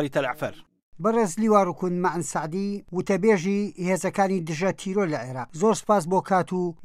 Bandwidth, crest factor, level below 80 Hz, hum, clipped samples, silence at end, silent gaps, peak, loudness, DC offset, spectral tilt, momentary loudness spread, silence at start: 15 kHz; 18 dB; -60 dBFS; none; under 0.1%; 0 s; 0.82-0.92 s; -6 dBFS; -25 LUFS; under 0.1%; -6 dB/octave; 8 LU; 0 s